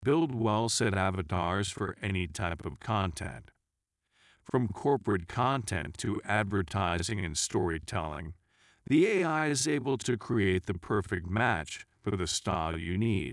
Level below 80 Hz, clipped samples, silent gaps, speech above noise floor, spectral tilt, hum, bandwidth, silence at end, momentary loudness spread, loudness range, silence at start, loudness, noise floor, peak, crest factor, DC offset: -54 dBFS; under 0.1%; none; 55 dB; -5 dB/octave; none; 12 kHz; 0 s; 8 LU; 4 LU; 0 s; -31 LUFS; -85 dBFS; -14 dBFS; 18 dB; under 0.1%